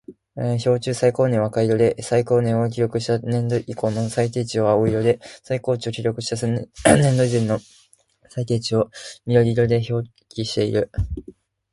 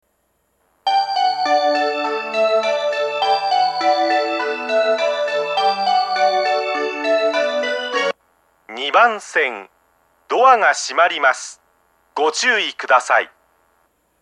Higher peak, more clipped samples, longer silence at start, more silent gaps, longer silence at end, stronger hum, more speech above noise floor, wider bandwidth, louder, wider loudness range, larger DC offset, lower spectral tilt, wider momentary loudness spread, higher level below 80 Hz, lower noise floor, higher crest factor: about the same, 0 dBFS vs 0 dBFS; neither; second, 0.1 s vs 0.85 s; neither; second, 0.4 s vs 0.95 s; neither; second, 37 dB vs 49 dB; about the same, 11.5 kHz vs 11 kHz; second, -21 LUFS vs -17 LUFS; about the same, 2 LU vs 2 LU; neither; first, -6 dB/octave vs -1 dB/octave; first, 10 LU vs 7 LU; first, -42 dBFS vs -74 dBFS; second, -57 dBFS vs -66 dBFS; about the same, 20 dB vs 18 dB